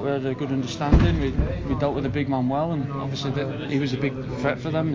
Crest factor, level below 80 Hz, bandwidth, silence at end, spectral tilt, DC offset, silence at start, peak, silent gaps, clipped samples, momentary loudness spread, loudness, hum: 20 dB; -32 dBFS; 7.6 kHz; 0 s; -7.5 dB/octave; under 0.1%; 0 s; -2 dBFS; none; under 0.1%; 7 LU; -25 LUFS; none